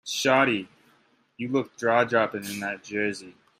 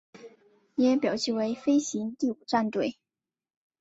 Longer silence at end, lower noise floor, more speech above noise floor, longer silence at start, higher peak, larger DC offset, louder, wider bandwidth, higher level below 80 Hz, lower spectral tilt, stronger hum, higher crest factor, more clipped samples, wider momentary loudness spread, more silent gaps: second, 0.3 s vs 0.9 s; second, -64 dBFS vs under -90 dBFS; second, 38 dB vs over 63 dB; about the same, 0.05 s vs 0.15 s; first, -6 dBFS vs -10 dBFS; neither; first, -25 LUFS vs -28 LUFS; first, 16 kHz vs 8 kHz; about the same, -72 dBFS vs -72 dBFS; about the same, -4 dB/octave vs -4.5 dB/octave; neither; about the same, 20 dB vs 18 dB; neither; first, 12 LU vs 8 LU; neither